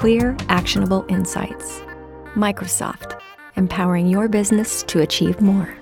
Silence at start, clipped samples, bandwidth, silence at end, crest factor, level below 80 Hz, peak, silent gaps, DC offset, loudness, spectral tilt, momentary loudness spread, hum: 0 s; under 0.1%; 17.5 kHz; 0 s; 18 dB; -40 dBFS; -2 dBFS; none; under 0.1%; -19 LUFS; -5 dB/octave; 15 LU; none